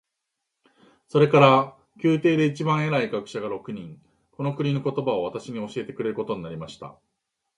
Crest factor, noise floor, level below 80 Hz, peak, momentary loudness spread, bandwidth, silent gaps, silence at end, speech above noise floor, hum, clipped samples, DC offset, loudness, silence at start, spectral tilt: 22 dB; -82 dBFS; -64 dBFS; -2 dBFS; 19 LU; 11 kHz; none; 0.65 s; 58 dB; none; under 0.1%; under 0.1%; -23 LUFS; 1.15 s; -7 dB/octave